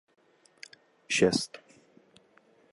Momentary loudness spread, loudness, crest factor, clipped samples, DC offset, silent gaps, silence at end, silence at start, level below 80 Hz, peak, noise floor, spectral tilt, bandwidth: 25 LU; -28 LUFS; 24 dB; under 0.1%; under 0.1%; none; 1.15 s; 1.1 s; -66 dBFS; -10 dBFS; -63 dBFS; -3.5 dB/octave; 11.5 kHz